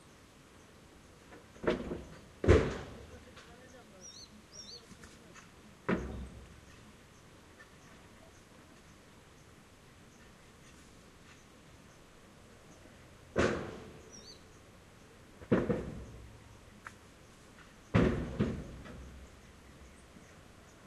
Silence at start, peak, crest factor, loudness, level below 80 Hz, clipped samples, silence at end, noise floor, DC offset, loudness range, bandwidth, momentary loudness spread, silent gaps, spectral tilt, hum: 1.3 s; -8 dBFS; 32 dB; -35 LUFS; -50 dBFS; under 0.1%; 0 s; -58 dBFS; under 0.1%; 21 LU; 13 kHz; 25 LU; none; -6.5 dB/octave; none